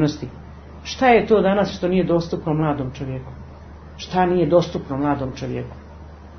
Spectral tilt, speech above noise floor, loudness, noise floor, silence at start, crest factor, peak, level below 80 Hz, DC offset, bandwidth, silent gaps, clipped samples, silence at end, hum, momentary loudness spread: -7 dB/octave; 20 dB; -20 LUFS; -39 dBFS; 0 s; 18 dB; -2 dBFS; -42 dBFS; under 0.1%; 6.6 kHz; none; under 0.1%; 0 s; none; 24 LU